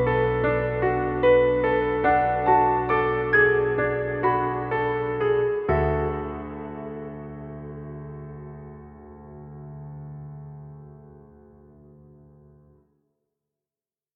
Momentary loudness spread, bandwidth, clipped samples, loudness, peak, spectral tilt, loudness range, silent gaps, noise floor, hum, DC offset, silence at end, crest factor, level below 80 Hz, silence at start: 22 LU; 5 kHz; under 0.1%; -23 LUFS; -8 dBFS; -10 dB/octave; 22 LU; none; under -90 dBFS; none; under 0.1%; 2.9 s; 18 dB; -42 dBFS; 0 s